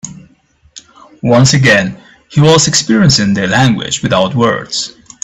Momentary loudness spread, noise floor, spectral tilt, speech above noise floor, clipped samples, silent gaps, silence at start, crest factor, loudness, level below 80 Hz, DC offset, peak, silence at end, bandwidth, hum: 11 LU; -49 dBFS; -4.5 dB/octave; 40 dB; under 0.1%; none; 0.05 s; 12 dB; -10 LUFS; -42 dBFS; under 0.1%; 0 dBFS; 0.35 s; 11 kHz; none